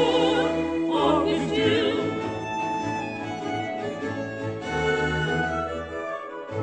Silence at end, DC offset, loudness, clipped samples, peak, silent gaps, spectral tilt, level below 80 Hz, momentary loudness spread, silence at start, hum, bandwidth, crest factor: 0 s; under 0.1%; -26 LUFS; under 0.1%; -10 dBFS; none; -5.5 dB/octave; -48 dBFS; 10 LU; 0 s; none; 9.4 kHz; 16 dB